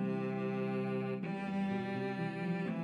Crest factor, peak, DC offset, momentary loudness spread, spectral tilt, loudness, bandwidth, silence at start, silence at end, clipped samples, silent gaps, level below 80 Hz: 10 dB; -26 dBFS; under 0.1%; 2 LU; -8.5 dB/octave; -37 LUFS; 8 kHz; 0 s; 0 s; under 0.1%; none; -80 dBFS